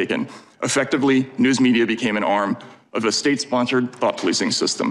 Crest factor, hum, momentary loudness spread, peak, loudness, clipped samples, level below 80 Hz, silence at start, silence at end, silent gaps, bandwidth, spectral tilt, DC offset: 14 dB; none; 8 LU; -6 dBFS; -20 LUFS; under 0.1%; -64 dBFS; 0 s; 0 s; none; 11.5 kHz; -3.5 dB/octave; under 0.1%